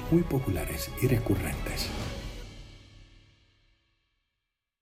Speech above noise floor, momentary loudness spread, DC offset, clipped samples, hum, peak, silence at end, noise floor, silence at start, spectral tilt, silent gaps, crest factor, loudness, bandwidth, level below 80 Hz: 57 dB; 19 LU; under 0.1%; under 0.1%; none; -12 dBFS; 1.6 s; -85 dBFS; 0 s; -6 dB/octave; none; 20 dB; -30 LUFS; 16.5 kHz; -42 dBFS